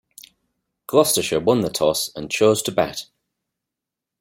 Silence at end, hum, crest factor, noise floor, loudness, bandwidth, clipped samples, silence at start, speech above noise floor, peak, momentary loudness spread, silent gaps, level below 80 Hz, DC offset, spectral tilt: 1.15 s; none; 20 dB; -85 dBFS; -19 LUFS; 16.5 kHz; under 0.1%; 0.9 s; 66 dB; -2 dBFS; 8 LU; none; -58 dBFS; under 0.1%; -3.5 dB/octave